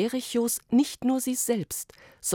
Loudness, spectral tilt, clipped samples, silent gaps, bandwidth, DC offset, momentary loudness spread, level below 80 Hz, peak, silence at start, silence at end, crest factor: -27 LUFS; -3.5 dB/octave; under 0.1%; none; 18 kHz; under 0.1%; 10 LU; -64 dBFS; -12 dBFS; 0 s; 0 s; 16 dB